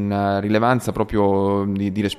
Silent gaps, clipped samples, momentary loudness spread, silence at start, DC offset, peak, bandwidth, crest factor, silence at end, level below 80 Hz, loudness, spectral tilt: none; under 0.1%; 4 LU; 0 s; under 0.1%; -4 dBFS; 14 kHz; 16 dB; 0 s; -44 dBFS; -20 LUFS; -7 dB/octave